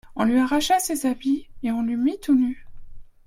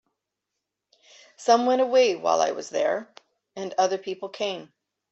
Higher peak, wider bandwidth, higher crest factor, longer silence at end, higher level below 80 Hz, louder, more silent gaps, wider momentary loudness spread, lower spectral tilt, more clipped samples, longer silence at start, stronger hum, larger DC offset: about the same, -6 dBFS vs -6 dBFS; first, 16.5 kHz vs 8.2 kHz; about the same, 16 dB vs 20 dB; second, 0.2 s vs 0.45 s; first, -48 dBFS vs -78 dBFS; about the same, -23 LUFS vs -24 LUFS; neither; second, 7 LU vs 14 LU; about the same, -3.5 dB/octave vs -3 dB/octave; neither; second, 0.05 s vs 1.4 s; neither; neither